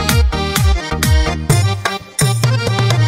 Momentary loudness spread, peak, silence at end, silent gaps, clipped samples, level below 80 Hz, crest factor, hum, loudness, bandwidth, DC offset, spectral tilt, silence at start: 3 LU; 0 dBFS; 0 s; none; under 0.1%; -20 dBFS; 14 dB; none; -15 LUFS; 16.5 kHz; under 0.1%; -4.5 dB/octave; 0 s